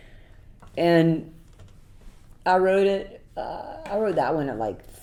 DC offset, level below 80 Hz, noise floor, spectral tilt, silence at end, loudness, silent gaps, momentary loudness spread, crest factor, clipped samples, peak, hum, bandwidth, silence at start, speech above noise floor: under 0.1%; -50 dBFS; -48 dBFS; -7.5 dB/octave; 0.05 s; -24 LUFS; none; 16 LU; 20 dB; under 0.1%; -6 dBFS; none; 15.5 kHz; 0.1 s; 25 dB